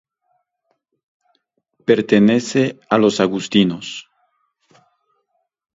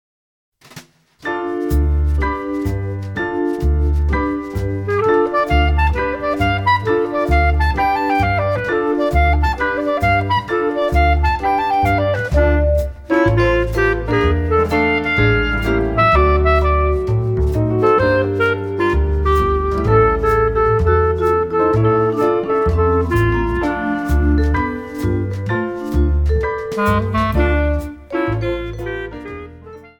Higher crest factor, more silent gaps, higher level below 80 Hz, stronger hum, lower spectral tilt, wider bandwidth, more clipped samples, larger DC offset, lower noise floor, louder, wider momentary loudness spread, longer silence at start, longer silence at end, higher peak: first, 20 dB vs 14 dB; neither; second, -60 dBFS vs -22 dBFS; neither; second, -5.5 dB/octave vs -8 dB/octave; second, 7.8 kHz vs 17 kHz; neither; neither; first, -71 dBFS vs -42 dBFS; about the same, -17 LUFS vs -17 LUFS; first, 14 LU vs 7 LU; first, 1.9 s vs 0.75 s; first, 1.75 s vs 0.1 s; about the same, 0 dBFS vs -2 dBFS